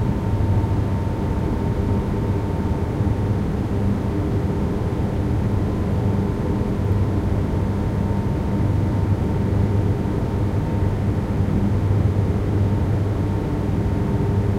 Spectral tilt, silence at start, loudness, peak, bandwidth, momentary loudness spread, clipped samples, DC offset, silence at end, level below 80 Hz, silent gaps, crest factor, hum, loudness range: -9 dB/octave; 0 s; -22 LUFS; -8 dBFS; 9.6 kHz; 3 LU; under 0.1%; under 0.1%; 0 s; -28 dBFS; none; 12 dB; none; 1 LU